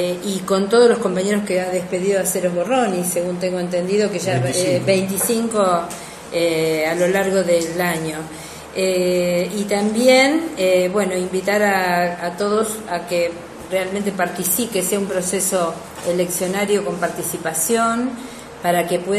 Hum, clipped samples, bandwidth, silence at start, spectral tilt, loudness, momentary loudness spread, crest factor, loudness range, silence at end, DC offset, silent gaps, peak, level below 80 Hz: none; under 0.1%; 14 kHz; 0 s; -4 dB/octave; -19 LUFS; 8 LU; 16 dB; 3 LU; 0 s; under 0.1%; none; -2 dBFS; -54 dBFS